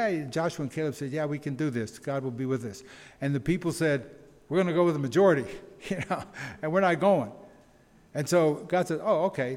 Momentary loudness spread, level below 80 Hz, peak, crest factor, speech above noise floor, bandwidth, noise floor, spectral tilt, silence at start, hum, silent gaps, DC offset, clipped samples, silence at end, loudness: 12 LU; -60 dBFS; -10 dBFS; 18 dB; 31 dB; 16.5 kHz; -58 dBFS; -6.5 dB/octave; 0 s; none; none; under 0.1%; under 0.1%; 0 s; -28 LUFS